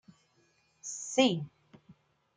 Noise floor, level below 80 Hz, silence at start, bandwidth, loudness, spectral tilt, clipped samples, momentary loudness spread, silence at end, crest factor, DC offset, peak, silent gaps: -70 dBFS; -78 dBFS; 0.85 s; 9.6 kHz; -30 LUFS; -4 dB/octave; under 0.1%; 18 LU; 0.45 s; 24 dB; under 0.1%; -12 dBFS; none